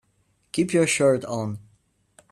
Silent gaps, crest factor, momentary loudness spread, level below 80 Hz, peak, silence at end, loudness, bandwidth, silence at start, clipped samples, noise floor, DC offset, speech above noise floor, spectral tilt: none; 16 dB; 13 LU; -64 dBFS; -8 dBFS; 0.75 s; -23 LUFS; 13 kHz; 0.55 s; under 0.1%; -67 dBFS; under 0.1%; 45 dB; -4.5 dB/octave